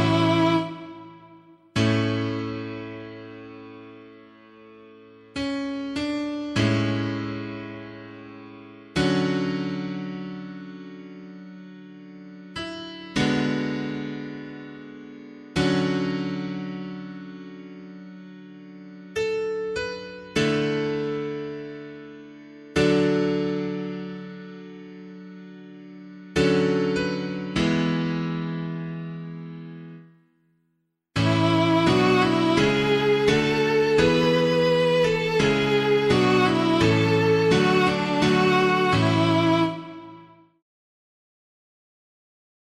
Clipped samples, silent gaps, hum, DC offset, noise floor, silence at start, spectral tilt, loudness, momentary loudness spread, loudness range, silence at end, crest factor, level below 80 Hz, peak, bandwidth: under 0.1%; none; none; under 0.1%; -73 dBFS; 0 s; -6 dB/octave; -23 LUFS; 23 LU; 13 LU; 2.4 s; 18 dB; -52 dBFS; -6 dBFS; 13.5 kHz